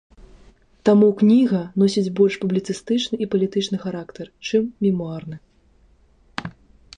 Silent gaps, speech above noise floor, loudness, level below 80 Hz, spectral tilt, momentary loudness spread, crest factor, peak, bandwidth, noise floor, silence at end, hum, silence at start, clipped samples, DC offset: none; 37 dB; -20 LUFS; -56 dBFS; -6.5 dB/octave; 18 LU; 16 dB; -4 dBFS; 9.8 kHz; -56 dBFS; 0.45 s; none; 0.85 s; under 0.1%; under 0.1%